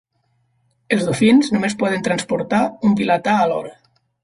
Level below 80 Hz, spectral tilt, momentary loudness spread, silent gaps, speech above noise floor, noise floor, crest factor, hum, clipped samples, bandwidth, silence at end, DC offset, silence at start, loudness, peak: -56 dBFS; -5.5 dB/octave; 7 LU; none; 48 dB; -65 dBFS; 16 dB; none; under 0.1%; 11.5 kHz; 0.5 s; under 0.1%; 0.9 s; -18 LUFS; -4 dBFS